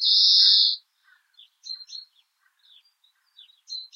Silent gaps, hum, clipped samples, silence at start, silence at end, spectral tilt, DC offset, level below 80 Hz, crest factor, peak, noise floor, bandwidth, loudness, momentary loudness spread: none; none; under 0.1%; 0 s; 0.1 s; 9.5 dB/octave; under 0.1%; under -90 dBFS; 20 dB; -4 dBFS; -67 dBFS; 14.5 kHz; -16 LUFS; 25 LU